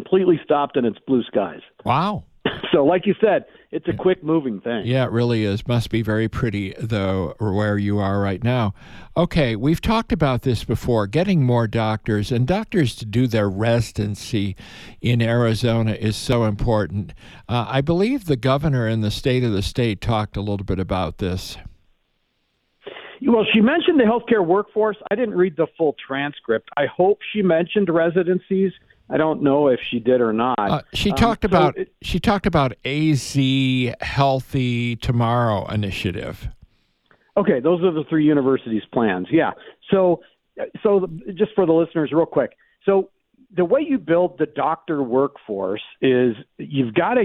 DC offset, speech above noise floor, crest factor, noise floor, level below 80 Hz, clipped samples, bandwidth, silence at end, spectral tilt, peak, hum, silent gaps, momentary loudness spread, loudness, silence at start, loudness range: under 0.1%; 49 dB; 16 dB; -69 dBFS; -40 dBFS; under 0.1%; 14 kHz; 0 s; -7 dB/octave; -4 dBFS; none; none; 8 LU; -20 LUFS; 0 s; 3 LU